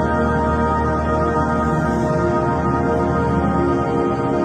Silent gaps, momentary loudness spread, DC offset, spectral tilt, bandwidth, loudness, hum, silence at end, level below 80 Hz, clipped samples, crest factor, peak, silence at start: none; 1 LU; under 0.1%; -8 dB/octave; 9.6 kHz; -18 LUFS; none; 0 s; -32 dBFS; under 0.1%; 12 dB; -6 dBFS; 0 s